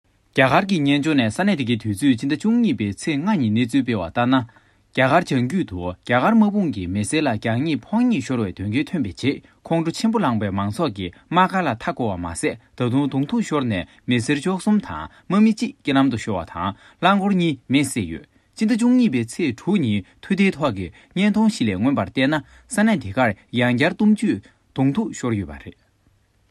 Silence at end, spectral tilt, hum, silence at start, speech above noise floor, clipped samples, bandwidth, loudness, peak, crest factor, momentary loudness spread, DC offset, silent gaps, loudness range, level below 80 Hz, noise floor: 0.8 s; -6 dB/octave; none; 0.35 s; 40 dB; under 0.1%; 12.5 kHz; -21 LUFS; -2 dBFS; 20 dB; 9 LU; under 0.1%; none; 2 LU; -54 dBFS; -61 dBFS